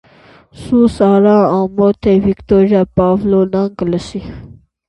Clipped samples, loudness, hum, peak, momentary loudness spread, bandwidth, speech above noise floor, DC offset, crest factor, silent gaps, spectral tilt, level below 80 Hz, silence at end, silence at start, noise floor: under 0.1%; -12 LUFS; none; 0 dBFS; 9 LU; 11 kHz; 32 dB; under 0.1%; 12 dB; none; -8.5 dB/octave; -38 dBFS; 0.4 s; 0.6 s; -44 dBFS